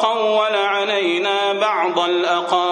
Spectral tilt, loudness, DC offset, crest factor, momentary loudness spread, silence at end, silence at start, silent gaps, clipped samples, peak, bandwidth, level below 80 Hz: -3 dB/octave; -18 LUFS; under 0.1%; 14 dB; 1 LU; 0 s; 0 s; none; under 0.1%; -2 dBFS; 9.8 kHz; -74 dBFS